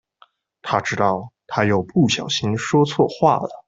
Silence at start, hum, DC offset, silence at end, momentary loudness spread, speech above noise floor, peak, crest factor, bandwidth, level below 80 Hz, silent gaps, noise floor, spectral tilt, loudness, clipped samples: 0.65 s; none; under 0.1%; 0.05 s; 7 LU; 37 dB; -2 dBFS; 18 dB; 8 kHz; -56 dBFS; none; -56 dBFS; -5.5 dB/octave; -20 LUFS; under 0.1%